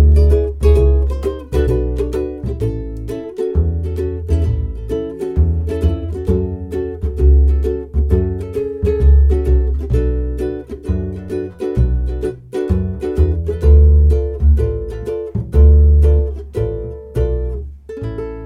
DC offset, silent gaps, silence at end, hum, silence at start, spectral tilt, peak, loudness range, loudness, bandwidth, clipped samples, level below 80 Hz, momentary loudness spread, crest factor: under 0.1%; none; 0 s; none; 0 s; -9.5 dB/octave; 0 dBFS; 6 LU; -17 LUFS; 3.9 kHz; under 0.1%; -16 dBFS; 12 LU; 14 dB